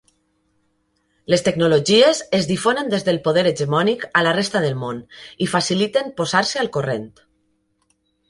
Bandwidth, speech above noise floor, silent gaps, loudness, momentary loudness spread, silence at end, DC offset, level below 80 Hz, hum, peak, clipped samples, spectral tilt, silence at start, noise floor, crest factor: 11.5 kHz; 48 dB; none; -19 LUFS; 13 LU; 1.2 s; under 0.1%; -58 dBFS; none; -2 dBFS; under 0.1%; -4.5 dB/octave; 1.3 s; -67 dBFS; 18 dB